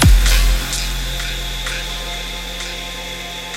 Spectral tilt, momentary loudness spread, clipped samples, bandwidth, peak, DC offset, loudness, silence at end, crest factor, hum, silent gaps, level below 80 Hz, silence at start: -3 dB/octave; 11 LU; under 0.1%; 16.5 kHz; -2 dBFS; under 0.1%; -20 LUFS; 0 s; 16 dB; none; none; -18 dBFS; 0 s